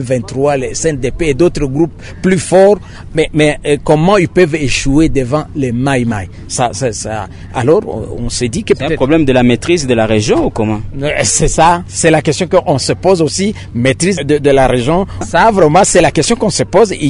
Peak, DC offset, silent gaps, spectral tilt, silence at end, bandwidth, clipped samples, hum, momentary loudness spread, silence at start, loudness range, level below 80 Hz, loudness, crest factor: 0 dBFS; under 0.1%; none; -5 dB/octave; 0 s; 11 kHz; under 0.1%; none; 8 LU; 0 s; 4 LU; -30 dBFS; -12 LUFS; 12 dB